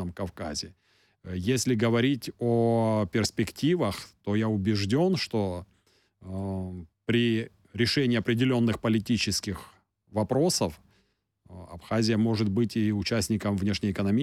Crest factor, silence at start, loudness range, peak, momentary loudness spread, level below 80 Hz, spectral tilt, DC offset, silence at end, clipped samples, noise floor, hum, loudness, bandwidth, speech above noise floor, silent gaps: 14 dB; 0 s; 3 LU; -14 dBFS; 12 LU; -56 dBFS; -5.5 dB/octave; under 0.1%; 0 s; under 0.1%; -71 dBFS; none; -27 LUFS; 15 kHz; 44 dB; none